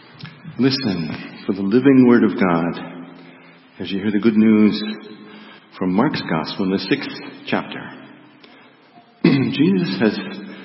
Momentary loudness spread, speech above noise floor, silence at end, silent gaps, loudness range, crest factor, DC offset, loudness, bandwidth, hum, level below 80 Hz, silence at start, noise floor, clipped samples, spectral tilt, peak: 21 LU; 31 dB; 0 s; none; 6 LU; 18 dB; under 0.1%; -18 LUFS; 5.8 kHz; none; -60 dBFS; 0.2 s; -49 dBFS; under 0.1%; -10 dB/octave; 0 dBFS